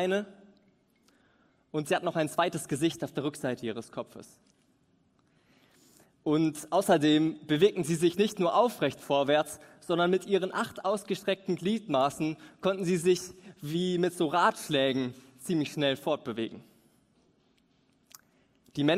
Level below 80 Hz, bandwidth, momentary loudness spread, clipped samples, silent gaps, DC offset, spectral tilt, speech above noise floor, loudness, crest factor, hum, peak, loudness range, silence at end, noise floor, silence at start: -72 dBFS; 16 kHz; 12 LU; under 0.1%; none; under 0.1%; -5 dB/octave; 40 dB; -29 LUFS; 20 dB; none; -10 dBFS; 9 LU; 0 s; -68 dBFS; 0 s